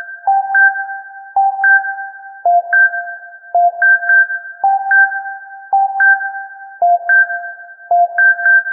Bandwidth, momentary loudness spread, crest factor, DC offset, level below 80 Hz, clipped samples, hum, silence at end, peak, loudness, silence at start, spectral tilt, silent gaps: 2.3 kHz; 17 LU; 12 dB; under 0.1%; -82 dBFS; under 0.1%; none; 0 s; -2 dBFS; -12 LUFS; 0 s; -5.5 dB/octave; none